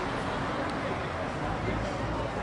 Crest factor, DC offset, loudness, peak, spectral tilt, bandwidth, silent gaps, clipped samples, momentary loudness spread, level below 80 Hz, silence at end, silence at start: 14 dB; under 0.1%; -32 LUFS; -18 dBFS; -6 dB/octave; 11.5 kHz; none; under 0.1%; 1 LU; -44 dBFS; 0 s; 0 s